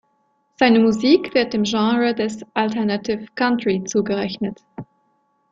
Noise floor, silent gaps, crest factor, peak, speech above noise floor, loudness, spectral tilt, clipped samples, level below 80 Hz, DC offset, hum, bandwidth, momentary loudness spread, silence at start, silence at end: -65 dBFS; none; 18 dB; -2 dBFS; 47 dB; -19 LUFS; -5 dB/octave; under 0.1%; -58 dBFS; under 0.1%; none; 7.8 kHz; 12 LU; 0.6 s; 0.7 s